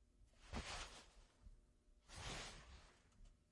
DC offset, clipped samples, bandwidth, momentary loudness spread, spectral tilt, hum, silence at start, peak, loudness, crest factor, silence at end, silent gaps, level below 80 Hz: under 0.1%; under 0.1%; 11.5 kHz; 18 LU; -3 dB/octave; none; 0 s; -36 dBFS; -53 LUFS; 22 dB; 0.05 s; none; -62 dBFS